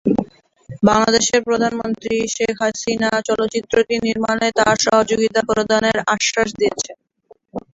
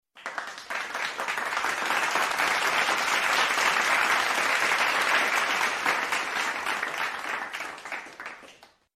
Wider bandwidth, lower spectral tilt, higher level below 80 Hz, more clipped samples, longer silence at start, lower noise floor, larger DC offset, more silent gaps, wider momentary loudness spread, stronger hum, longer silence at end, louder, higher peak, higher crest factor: second, 8.2 kHz vs 15.5 kHz; first, -3.5 dB/octave vs 0 dB/octave; first, -50 dBFS vs -68 dBFS; neither; about the same, 0.05 s vs 0.15 s; about the same, -52 dBFS vs -53 dBFS; neither; neither; second, 7 LU vs 13 LU; neither; second, 0.15 s vs 0.35 s; first, -17 LUFS vs -25 LUFS; first, -2 dBFS vs -10 dBFS; about the same, 16 dB vs 18 dB